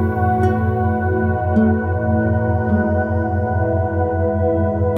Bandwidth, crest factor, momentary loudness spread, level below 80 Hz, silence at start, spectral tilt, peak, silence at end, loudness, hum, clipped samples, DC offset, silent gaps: 3.3 kHz; 12 dB; 3 LU; -34 dBFS; 0 s; -11 dB/octave; -4 dBFS; 0 s; -18 LUFS; none; under 0.1%; under 0.1%; none